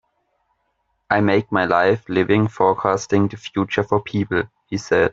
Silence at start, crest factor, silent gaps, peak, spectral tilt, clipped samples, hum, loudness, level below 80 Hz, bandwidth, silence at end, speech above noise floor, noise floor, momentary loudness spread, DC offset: 1.1 s; 20 dB; none; 0 dBFS; -6.5 dB/octave; under 0.1%; none; -19 LUFS; -54 dBFS; 7.8 kHz; 0 s; 51 dB; -70 dBFS; 6 LU; under 0.1%